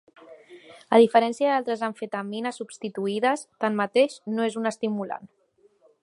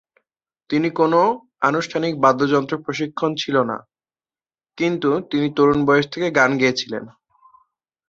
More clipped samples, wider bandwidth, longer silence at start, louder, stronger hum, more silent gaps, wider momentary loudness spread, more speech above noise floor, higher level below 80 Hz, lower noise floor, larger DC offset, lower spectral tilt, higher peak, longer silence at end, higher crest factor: neither; first, 11.5 kHz vs 7.8 kHz; second, 0.3 s vs 0.7 s; second, -25 LUFS vs -19 LUFS; neither; neither; first, 13 LU vs 9 LU; second, 37 dB vs over 71 dB; second, -80 dBFS vs -58 dBFS; second, -61 dBFS vs under -90 dBFS; neither; about the same, -5 dB/octave vs -5.5 dB/octave; about the same, -4 dBFS vs -2 dBFS; second, 0.75 s vs 1 s; about the same, 20 dB vs 18 dB